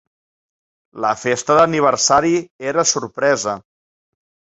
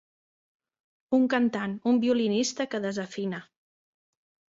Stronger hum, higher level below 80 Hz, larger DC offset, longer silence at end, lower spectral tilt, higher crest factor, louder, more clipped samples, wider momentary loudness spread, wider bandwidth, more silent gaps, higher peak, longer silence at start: neither; first, -56 dBFS vs -72 dBFS; neither; about the same, 0.95 s vs 1.05 s; second, -3 dB/octave vs -4.5 dB/octave; about the same, 18 dB vs 18 dB; first, -17 LUFS vs -27 LUFS; neither; about the same, 8 LU vs 10 LU; about the same, 8.4 kHz vs 7.8 kHz; first, 2.51-2.59 s vs none; first, -2 dBFS vs -10 dBFS; second, 0.95 s vs 1.1 s